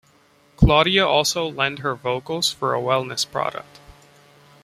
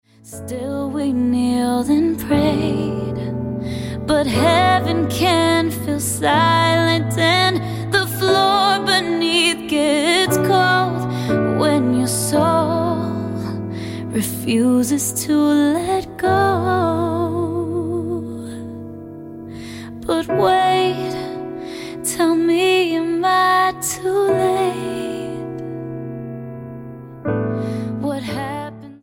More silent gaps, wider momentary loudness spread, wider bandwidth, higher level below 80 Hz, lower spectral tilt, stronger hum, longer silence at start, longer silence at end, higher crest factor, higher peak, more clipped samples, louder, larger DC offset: neither; second, 10 LU vs 15 LU; about the same, 15.5 kHz vs 17 kHz; first, -36 dBFS vs -46 dBFS; about the same, -4 dB/octave vs -4.5 dB/octave; neither; first, 0.6 s vs 0.25 s; first, 0.7 s vs 0.05 s; about the same, 20 dB vs 18 dB; about the same, -2 dBFS vs -2 dBFS; neither; about the same, -20 LUFS vs -18 LUFS; neither